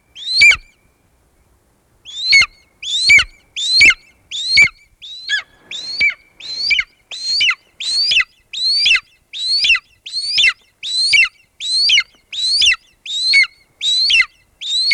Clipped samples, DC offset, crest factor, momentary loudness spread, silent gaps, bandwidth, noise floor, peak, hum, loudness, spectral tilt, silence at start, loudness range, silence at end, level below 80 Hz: under 0.1%; under 0.1%; 16 dB; 17 LU; none; 13.5 kHz; -57 dBFS; 0 dBFS; none; -12 LUFS; 2 dB/octave; 0.15 s; 5 LU; 0 s; -48 dBFS